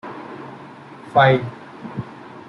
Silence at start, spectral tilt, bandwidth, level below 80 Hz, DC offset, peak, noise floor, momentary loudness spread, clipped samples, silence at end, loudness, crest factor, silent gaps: 0.05 s; -7.5 dB/octave; 6.8 kHz; -60 dBFS; under 0.1%; -2 dBFS; -39 dBFS; 24 LU; under 0.1%; 0.1 s; -17 LUFS; 20 dB; none